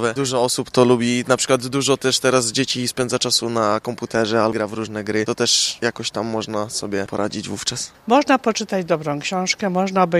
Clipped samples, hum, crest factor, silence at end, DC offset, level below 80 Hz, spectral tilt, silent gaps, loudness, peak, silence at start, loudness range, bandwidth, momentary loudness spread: under 0.1%; none; 20 dB; 0 s; under 0.1%; -56 dBFS; -3.5 dB/octave; none; -19 LUFS; 0 dBFS; 0 s; 3 LU; 15 kHz; 8 LU